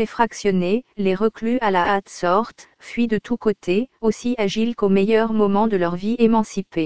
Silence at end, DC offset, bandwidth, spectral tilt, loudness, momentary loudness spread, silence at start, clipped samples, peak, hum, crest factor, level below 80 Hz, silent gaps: 0 s; 1%; 8 kHz; -6 dB/octave; -20 LUFS; 5 LU; 0 s; under 0.1%; -2 dBFS; none; 18 dB; -50 dBFS; none